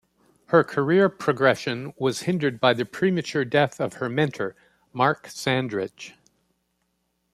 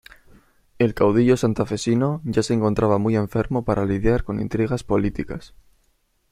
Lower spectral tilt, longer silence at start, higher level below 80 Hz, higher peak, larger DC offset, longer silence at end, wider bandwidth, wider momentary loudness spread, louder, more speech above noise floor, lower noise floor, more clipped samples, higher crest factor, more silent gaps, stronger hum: second, -5.5 dB/octave vs -7 dB/octave; second, 0.5 s vs 0.8 s; second, -66 dBFS vs -40 dBFS; about the same, -4 dBFS vs -4 dBFS; neither; first, 1.25 s vs 0.85 s; about the same, 14 kHz vs 14 kHz; first, 11 LU vs 6 LU; about the same, -23 LUFS vs -21 LUFS; first, 50 dB vs 45 dB; first, -73 dBFS vs -65 dBFS; neither; about the same, 20 dB vs 18 dB; neither; neither